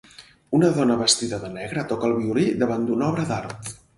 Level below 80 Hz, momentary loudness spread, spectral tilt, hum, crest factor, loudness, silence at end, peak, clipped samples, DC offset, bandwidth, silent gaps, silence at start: -56 dBFS; 11 LU; -4.5 dB/octave; none; 18 dB; -22 LUFS; 0.2 s; -4 dBFS; under 0.1%; under 0.1%; 11.5 kHz; none; 0.2 s